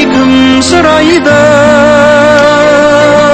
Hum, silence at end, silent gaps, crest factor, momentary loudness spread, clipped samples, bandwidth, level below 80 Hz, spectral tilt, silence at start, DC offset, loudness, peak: none; 0 s; none; 4 dB; 1 LU; 6%; 9.4 kHz; -32 dBFS; -4.5 dB/octave; 0 s; under 0.1%; -4 LUFS; 0 dBFS